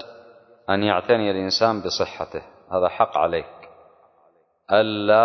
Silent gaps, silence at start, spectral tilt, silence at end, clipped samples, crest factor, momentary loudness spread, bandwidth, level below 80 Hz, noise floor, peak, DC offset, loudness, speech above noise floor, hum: none; 0 s; -4.5 dB/octave; 0 s; under 0.1%; 20 dB; 14 LU; 6.4 kHz; -54 dBFS; -61 dBFS; -2 dBFS; under 0.1%; -22 LUFS; 40 dB; none